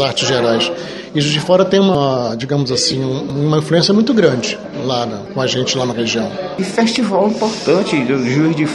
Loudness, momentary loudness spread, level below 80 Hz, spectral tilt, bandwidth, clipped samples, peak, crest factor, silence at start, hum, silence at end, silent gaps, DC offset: -15 LUFS; 8 LU; -50 dBFS; -5 dB/octave; 11.5 kHz; under 0.1%; 0 dBFS; 14 dB; 0 s; none; 0 s; none; under 0.1%